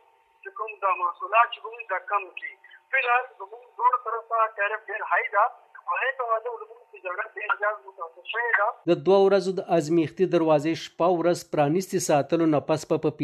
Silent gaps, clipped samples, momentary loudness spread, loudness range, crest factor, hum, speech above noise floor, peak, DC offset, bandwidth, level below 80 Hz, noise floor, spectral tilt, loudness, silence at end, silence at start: none; under 0.1%; 15 LU; 5 LU; 20 dB; none; 22 dB; -6 dBFS; under 0.1%; 14 kHz; -74 dBFS; -47 dBFS; -5 dB/octave; -25 LUFS; 0 s; 0.45 s